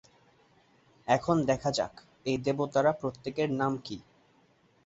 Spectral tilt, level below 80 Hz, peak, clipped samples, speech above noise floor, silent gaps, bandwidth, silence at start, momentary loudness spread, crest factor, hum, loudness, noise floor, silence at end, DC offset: -6 dB/octave; -62 dBFS; -12 dBFS; under 0.1%; 36 dB; none; 8 kHz; 1.05 s; 12 LU; 20 dB; none; -30 LUFS; -65 dBFS; 0.85 s; under 0.1%